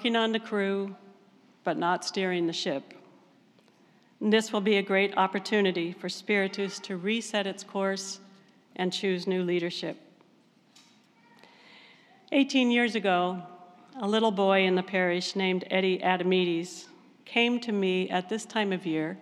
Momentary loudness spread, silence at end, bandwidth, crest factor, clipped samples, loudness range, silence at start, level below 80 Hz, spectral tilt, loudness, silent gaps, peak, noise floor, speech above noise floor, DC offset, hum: 11 LU; 0 s; 12.5 kHz; 18 dB; under 0.1%; 7 LU; 0 s; under -90 dBFS; -4.5 dB/octave; -28 LUFS; none; -10 dBFS; -62 dBFS; 35 dB; under 0.1%; none